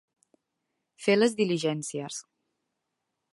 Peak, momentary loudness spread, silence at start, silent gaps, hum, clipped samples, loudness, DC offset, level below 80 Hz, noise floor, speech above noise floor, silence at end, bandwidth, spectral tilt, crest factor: -10 dBFS; 14 LU; 1 s; none; none; under 0.1%; -27 LUFS; under 0.1%; -80 dBFS; -83 dBFS; 56 dB; 1.1 s; 11.5 kHz; -4.5 dB/octave; 20 dB